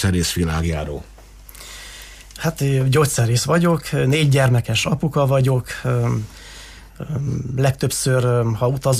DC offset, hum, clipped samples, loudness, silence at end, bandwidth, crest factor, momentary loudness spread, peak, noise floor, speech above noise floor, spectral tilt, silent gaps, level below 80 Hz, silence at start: under 0.1%; none; under 0.1%; -19 LUFS; 0 s; 15.5 kHz; 14 dB; 19 LU; -6 dBFS; -41 dBFS; 22 dB; -5.5 dB/octave; none; -38 dBFS; 0 s